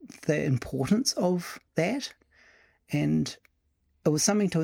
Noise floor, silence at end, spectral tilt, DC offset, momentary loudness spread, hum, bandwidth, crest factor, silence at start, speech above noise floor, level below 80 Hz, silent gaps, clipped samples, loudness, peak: -72 dBFS; 0 s; -5 dB/octave; under 0.1%; 10 LU; none; 17 kHz; 18 dB; 0 s; 45 dB; -58 dBFS; none; under 0.1%; -28 LUFS; -10 dBFS